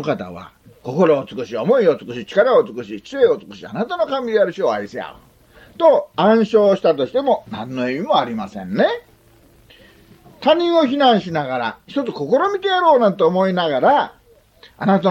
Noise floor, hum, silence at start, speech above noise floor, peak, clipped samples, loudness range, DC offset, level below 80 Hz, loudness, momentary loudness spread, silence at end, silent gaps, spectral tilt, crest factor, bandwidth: -51 dBFS; none; 0 s; 34 dB; -2 dBFS; under 0.1%; 4 LU; under 0.1%; -58 dBFS; -17 LUFS; 13 LU; 0 s; none; -6.5 dB/octave; 16 dB; 8 kHz